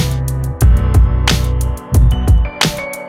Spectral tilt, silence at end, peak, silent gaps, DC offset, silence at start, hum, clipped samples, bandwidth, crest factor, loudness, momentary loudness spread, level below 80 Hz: -5 dB/octave; 0 s; 0 dBFS; none; under 0.1%; 0 s; none; under 0.1%; 16 kHz; 12 dB; -14 LUFS; 6 LU; -14 dBFS